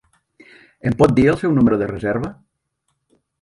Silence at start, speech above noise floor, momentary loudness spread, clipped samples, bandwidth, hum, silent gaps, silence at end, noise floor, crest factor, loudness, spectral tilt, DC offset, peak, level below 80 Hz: 0.85 s; 56 dB; 12 LU; under 0.1%; 11.5 kHz; none; none; 1.1 s; -72 dBFS; 20 dB; -17 LUFS; -8.5 dB/octave; under 0.1%; 0 dBFS; -44 dBFS